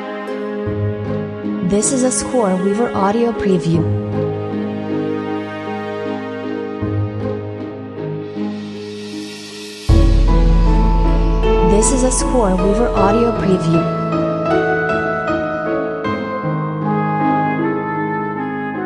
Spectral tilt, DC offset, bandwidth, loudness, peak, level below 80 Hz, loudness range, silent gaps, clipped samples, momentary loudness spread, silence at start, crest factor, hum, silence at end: -5.5 dB/octave; under 0.1%; 11 kHz; -18 LUFS; 0 dBFS; -22 dBFS; 9 LU; none; under 0.1%; 11 LU; 0 s; 16 dB; none; 0 s